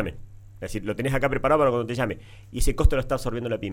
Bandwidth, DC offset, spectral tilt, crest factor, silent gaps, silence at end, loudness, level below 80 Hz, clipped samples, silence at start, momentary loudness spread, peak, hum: 16.5 kHz; under 0.1%; -6 dB/octave; 18 dB; none; 0 s; -25 LUFS; -30 dBFS; under 0.1%; 0 s; 14 LU; -6 dBFS; none